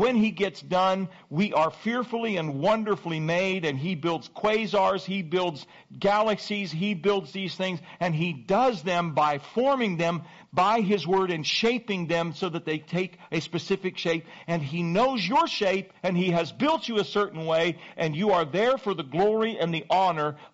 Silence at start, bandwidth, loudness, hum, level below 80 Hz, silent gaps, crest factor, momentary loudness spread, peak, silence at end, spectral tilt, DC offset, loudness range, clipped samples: 0 s; 8 kHz; -26 LUFS; none; -64 dBFS; none; 12 dB; 7 LU; -14 dBFS; 0.05 s; -4 dB/octave; under 0.1%; 2 LU; under 0.1%